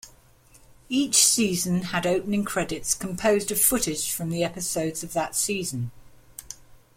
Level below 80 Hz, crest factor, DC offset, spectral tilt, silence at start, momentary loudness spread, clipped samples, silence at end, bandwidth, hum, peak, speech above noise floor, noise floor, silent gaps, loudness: -52 dBFS; 22 dB; under 0.1%; -3 dB/octave; 0.05 s; 19 LU; under 0.1%; 0.2 s; 16.5 kHz; none; -4 dBFS; 30 dB; -55 dBFS; none; -24 LUFS